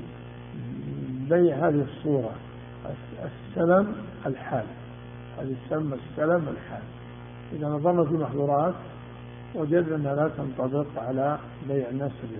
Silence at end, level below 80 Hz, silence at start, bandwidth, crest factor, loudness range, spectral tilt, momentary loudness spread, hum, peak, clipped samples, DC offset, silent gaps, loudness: 0 s; -54 dBFS; 0 s; 3.7 kHz; 20 dB; 5 LU; -8 dB/octave; 20 LU; 60 Hz at -45 dBFS; -8 dBFS; under 0.1%; under 0.1%; none; -27 LUFS